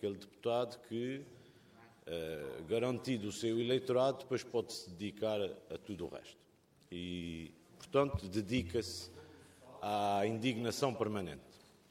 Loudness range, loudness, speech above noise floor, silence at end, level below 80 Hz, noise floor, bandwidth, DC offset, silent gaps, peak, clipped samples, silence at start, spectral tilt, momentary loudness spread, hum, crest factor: 5 LU; -38 LUFS; 25 dB; 0.35 s; -64 dBFS; -62 dBFS; 16.5 kHz; under 0.1%; none; -18 dBFS; under 0.1%; 0 s; -5.5 dB/octave; 17 LU; none; 20 dB